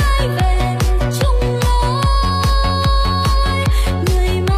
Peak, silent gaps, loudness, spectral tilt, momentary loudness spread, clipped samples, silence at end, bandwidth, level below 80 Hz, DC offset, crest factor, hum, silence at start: -2 dBFS; none; -16 LUFS; -5.5 dB/octave; 1 LU; under 0.1%; 0 s; 15 kHz; -16 dBFS; under 0.1%; 12 dB; none; 0 s